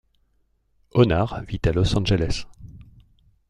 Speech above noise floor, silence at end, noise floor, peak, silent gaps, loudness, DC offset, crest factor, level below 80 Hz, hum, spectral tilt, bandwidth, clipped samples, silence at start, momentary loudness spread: 46 dB; 0.65 s; -66 dBFS; -4 dBFS; none; -22 LUFS; under 0.1%; 20 dB; -36 dBFS; none; -6.5 dB/octave; 10.5 kHz; under 0.1%; 0.95 s; 10 LU